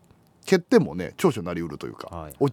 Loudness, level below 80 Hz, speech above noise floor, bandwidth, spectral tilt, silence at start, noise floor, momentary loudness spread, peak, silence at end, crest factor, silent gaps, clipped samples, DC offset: -24 LUFS; -54 dBFS; 20 dB; 18.5 kHz; -6.5 dB/octave; 0.45 s; -44 dBFS; 18 LU; -4 dBFS; 0 s; 20 dB; none; under 0.1%; under 0.1%